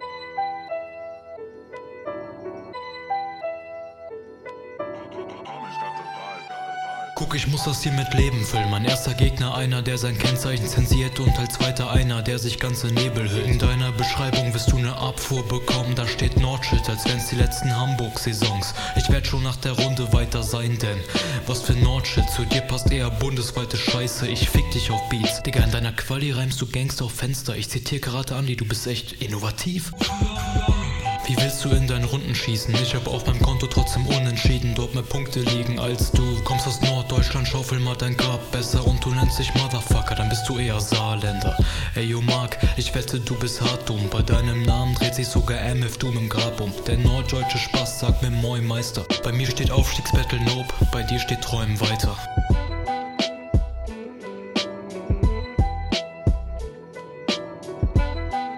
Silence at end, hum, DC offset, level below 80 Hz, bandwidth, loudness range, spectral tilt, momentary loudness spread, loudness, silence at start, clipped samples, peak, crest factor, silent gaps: 0 s; none; under 0.1%; -28 dBFS; 17 kHz; 5 LU; -5 dB/octave; 11 LU; -23 LUFS; 0 s; under 0.1%; -4 dBFS; 18 dB; none